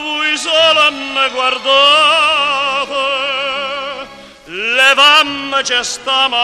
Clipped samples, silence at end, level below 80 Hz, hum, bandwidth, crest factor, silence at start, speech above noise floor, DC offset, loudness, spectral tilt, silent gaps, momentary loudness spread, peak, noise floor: under 0.1%; 0 s; -52 dBFS; none; 15 kHz; 14 dB; 0 s; 22 dB; under 0.1%; -11 LUFS; 0 dB/octave; none; 13 LU; 0 dBFS; -34 dBFS